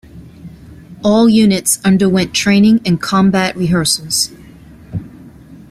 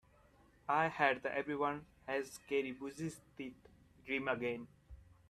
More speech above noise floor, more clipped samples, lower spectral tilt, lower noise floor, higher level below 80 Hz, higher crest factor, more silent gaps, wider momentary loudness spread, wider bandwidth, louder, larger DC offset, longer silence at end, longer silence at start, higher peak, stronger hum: about the same, 26 dB vs 29 dB; neither; about the same, -4.5 dB/octave vs -5 dB/octave; second, -38 dBFS vs -67 dBFS; first, -44 dBFS vs -68 dBFS; second, 14 dB vs 22 dB; neither; second, 11 LU vs 16 LU; about the same, 15 kHz vs 14 kHz; first, -12 LUFS vs -38 LUFS; neither; about the same, 0.15 s vs 0.15 s; second, 0.15 s vs 0.7 s; first, 0 dBFS vs -18 dBFS; neither